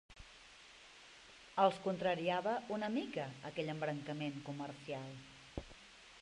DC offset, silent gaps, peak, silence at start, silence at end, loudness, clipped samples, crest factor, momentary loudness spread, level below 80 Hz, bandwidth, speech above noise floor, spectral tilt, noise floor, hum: under 0.1%; none; -18 dBFS; 0.1 s; 0 s; -40 LUFS; under 0.1%; 22 dB; 23 LU; -68 dBFS; 11.5 kHz; 21 dB; -6 dB/octave; -60 dBFS; none